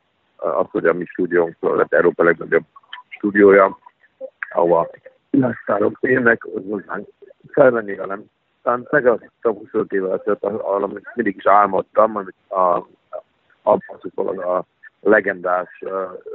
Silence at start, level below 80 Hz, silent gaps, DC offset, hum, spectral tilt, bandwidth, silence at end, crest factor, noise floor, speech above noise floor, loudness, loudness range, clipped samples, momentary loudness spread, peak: 0.4 s; -62 dBFS; none; under 0.1%; none; -5.5 dB/octave; 4 kHz; 0 s; 18 dB; -41 dBFS; 23 dB; -18 LUFS; 4 LU; under 0.1%; 14 LU; 0 dBFS